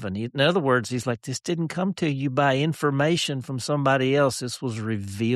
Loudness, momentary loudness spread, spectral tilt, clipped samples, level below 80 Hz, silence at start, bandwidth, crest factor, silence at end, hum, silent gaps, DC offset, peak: -24 LUFS; 8 LU; -5.5 dB/octave; under 0.1%; -64 dBFS; 0 s; 13 kHz; 16 dB; 0 s; none; none; under 0.1%; -8 dBFS